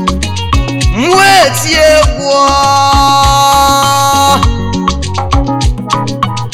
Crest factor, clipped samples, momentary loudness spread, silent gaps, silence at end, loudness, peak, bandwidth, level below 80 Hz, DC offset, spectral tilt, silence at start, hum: 8 dB; 0.9%; 8 LU; none; 0 s; -9 LUFS; 0 dBFS; 18.5 kHz; -18 dBFS; 3%; -4 dB/octave; 0 s; none